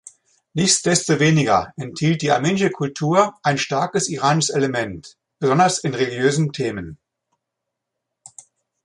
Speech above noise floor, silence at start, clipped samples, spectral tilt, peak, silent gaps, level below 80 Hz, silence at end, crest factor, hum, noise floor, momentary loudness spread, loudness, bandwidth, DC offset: 62 dB; 0.55 s; under 0.1%; -4.5 dB/octave; -2 dBFS; none; -54 dBFS; 1.9 s; 18 dB; none; -81 dBFS; 10 LU; -19 LUFS; 11.5 kHz; under 0.1%